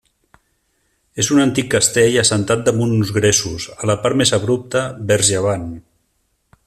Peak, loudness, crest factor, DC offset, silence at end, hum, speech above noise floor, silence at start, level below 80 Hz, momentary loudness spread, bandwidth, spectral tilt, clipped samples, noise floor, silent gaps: 0 dBFS; -16 LUFS; 18 dB; under 0.1%; 0.85 s; none; 50 dB; 1.15 s; -48 dBFS; 10 LU; 15 kHz; -4 dB/octave; under 0.1%; -66 dBFS; none